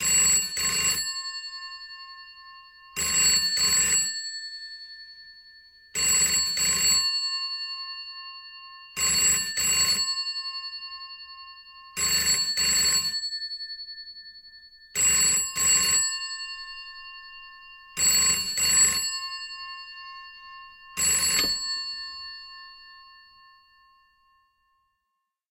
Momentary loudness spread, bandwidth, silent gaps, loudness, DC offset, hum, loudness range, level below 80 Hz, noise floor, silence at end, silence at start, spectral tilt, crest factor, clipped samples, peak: 23 LU; 16 kHz; none; -22 LUFS; under 0.1%; none; 4 LU; -56 dBFS; -81 dBFS; 2.4 s; 0 s; 1.5 dB/octave; 18 dB; under 0.1%; -10 dBFS